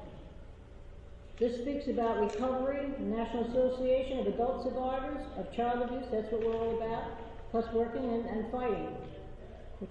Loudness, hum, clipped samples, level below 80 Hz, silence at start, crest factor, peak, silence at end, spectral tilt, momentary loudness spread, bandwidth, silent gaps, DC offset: -34 LUFS; none; under 0.1%; -50 dBFS; 0 s; 14 dB; -20 dBFS; 0 s; -7.5 dB/octave; 20 LU; 8.6 kHz; none; under 0.1%